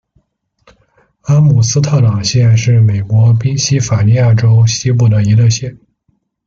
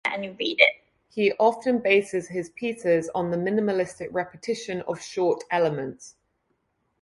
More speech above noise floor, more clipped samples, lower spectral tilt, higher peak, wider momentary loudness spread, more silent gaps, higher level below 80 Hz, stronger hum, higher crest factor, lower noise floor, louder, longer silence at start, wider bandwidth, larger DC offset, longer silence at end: about the same, 52 dB vs 49 dB; neither; about the same, -5.5 dB/octave vs -4.5 dB/octave; about the same, -2 dBFS vs -2 dBFS; second, 4 LU vs 12 LU; neither; first, -42 dBFS vs -66 dBFS; neither; second, 10 dB vs 24 dB; second, -61 dBFS vs -73 dBFS; first, -11 LUFS vs -25 LUFS; first, 1.25 s vs 0.05 s; second, 7.4 kHz vs 11.5 kHz; neither; second, 0.75 s vs 0.9 s